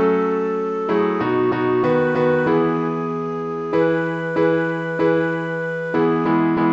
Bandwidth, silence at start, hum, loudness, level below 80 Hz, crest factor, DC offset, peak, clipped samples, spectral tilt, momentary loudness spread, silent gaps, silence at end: 7.4 kHz; 0 s; none; -20 LUFS; -58 dBFS; 12 dB; under 0.1%; -6 dBFS; under 0.1%; -8.5 dB/octave; 6 LU; none; 0 s